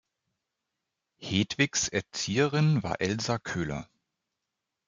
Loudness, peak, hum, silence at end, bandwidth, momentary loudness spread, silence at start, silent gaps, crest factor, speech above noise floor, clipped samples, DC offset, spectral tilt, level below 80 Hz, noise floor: -28 LUFS; -10 dBFS; none; 1.05 s; 9.2 kHz; 8 LU; 1.2 s; none; 20 dB; 58 dB; under 0.1%; under 0.1%; -4.5 dB/octave; -60 dBFS; -86 dBFS